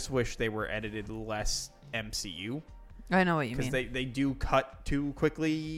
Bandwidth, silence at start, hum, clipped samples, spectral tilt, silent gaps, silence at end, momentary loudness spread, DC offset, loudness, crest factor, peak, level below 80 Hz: 16.5 kHz; 0 s; none; under 0.1%; -5 dB/octave; none; 0 s; 10 LU; under 0.1%; -32 LUFS; 20 dB; -12 dBFS; -44 dBFS